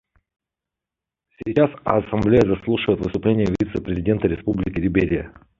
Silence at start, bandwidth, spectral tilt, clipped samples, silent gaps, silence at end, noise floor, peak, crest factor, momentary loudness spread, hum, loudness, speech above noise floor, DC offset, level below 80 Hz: 1.4 s; 7.4 kHz; -8.5 dB/octave; under 0.1%; none; 0.3 s; -87 dBFS; -2 dBFS; 20 dB; 7 LU; none; -21 LUFS; 67 dB; under 0.1%; -40 dBFS